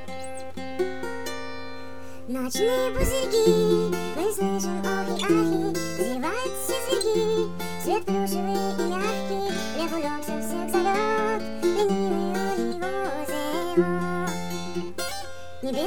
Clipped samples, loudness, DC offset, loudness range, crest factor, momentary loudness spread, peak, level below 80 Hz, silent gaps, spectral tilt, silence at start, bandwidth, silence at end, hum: under 0.1%; -26 LUFS; 2%; 3 LU; 18 dB; 11 LU; -8 dBFS; -46 dBFS; none; -4.5 dB/octave; 0 s; 19 kHz; 0 s; none